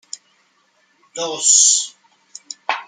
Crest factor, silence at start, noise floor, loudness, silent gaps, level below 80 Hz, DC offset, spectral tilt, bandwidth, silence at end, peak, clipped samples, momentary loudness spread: 20 dB; 1.15 s; -61 dBFS; -13 LUFS; none; -86 dBFS; under 0.1%; 2 dB/octave; 11 kHz; 0.05 s; -2 dBFS; under 0.1%; 25 LU